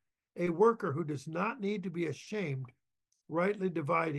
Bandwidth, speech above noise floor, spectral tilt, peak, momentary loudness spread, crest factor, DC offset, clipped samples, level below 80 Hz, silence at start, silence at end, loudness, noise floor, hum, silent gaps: 12 kHz; 49 dB; -7.5 dB/octave; -16 dBFS; 10 LU; 18 dB; under 0.1%; under 0.1%; -80 dBFS; 0.35 s; 0 s; -34 LUFS; -82 dBFS; none; none